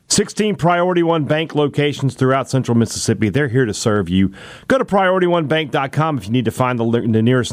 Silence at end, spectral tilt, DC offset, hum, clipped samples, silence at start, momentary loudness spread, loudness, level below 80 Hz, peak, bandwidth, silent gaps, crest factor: 0 s; -5.5 dB/octave; under 0.1%; none; under 0.1%; 0.1 s; 4 LU; -17 LUFS; -48 dBFS; -4 dBFS; 16 kHz; none; 12 dB